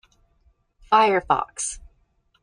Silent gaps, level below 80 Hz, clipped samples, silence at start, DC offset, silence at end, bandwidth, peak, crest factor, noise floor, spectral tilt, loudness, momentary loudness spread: none; -52 dBFS; under 0.1%; 0.9 s; under 0.1%; 0.65 s; 10.5 kHz; -4 dBFS; 20 dB; -65 dBFS; -2.5 dB/octave; -21 LUFS; 12 LU